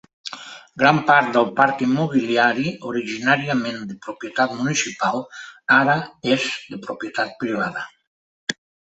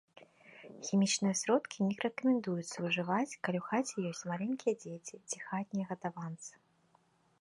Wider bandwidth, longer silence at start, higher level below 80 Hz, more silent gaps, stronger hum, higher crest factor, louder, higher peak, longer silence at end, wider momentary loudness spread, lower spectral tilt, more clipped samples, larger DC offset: second, 8.2 kHz vs 11.5 kHz; about the same, 0.25 s vs 0.2 s; first, -64 dBFS vs -80 dBFS; first, 8.07-8.47 s vs none; neither; about the same, 20 dB vs 20 dB; first, -20 LUFS vs -35 LUFS; first, 0 dBFS vs -16 dBFS; second, 0.45 s vs 0.9 s; first, 17 LU vs 14 LU; about the same, -4.5 dB/octave vs -4.5 dB/octave; neither; neither